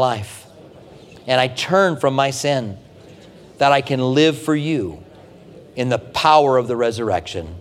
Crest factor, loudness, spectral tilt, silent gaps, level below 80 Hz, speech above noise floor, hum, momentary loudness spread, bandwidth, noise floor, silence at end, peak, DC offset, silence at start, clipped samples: 18 dB; -18 LUFS; -5 dB/octave; none; -52 dBFS; 25 dB; none; 17 LU; 16 kHz; -43 dBFS; 0 s; 0 dBFS; under 0.1%; 0 s; under 0.1%